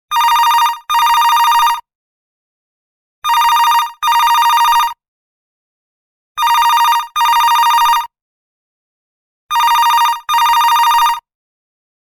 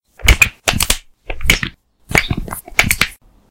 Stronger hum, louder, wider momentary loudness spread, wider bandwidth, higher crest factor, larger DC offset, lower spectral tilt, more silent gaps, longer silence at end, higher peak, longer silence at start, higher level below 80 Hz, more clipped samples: neither; first, -11 LUFS vs -15 LUFS; second, 7 LU vs 12 LU; about the same, 19 kHz vs over 20 kHz; about the same, 12 dB vs 16 dB; neither; second, 3.5 dB/octave vs -2.5 dB/octave; first, 1.95-3.22 s, 5.08-6.35 s, 8.22-9.49 s vs none; first, 1 s vs 0.35 s; about the same, 0 dBFS vs 0 dBFS; about the same, 0.1 s vs 0.2 s; second, -52 dBFS vs -24 dBFS; second, under 0.1% vs 0.3%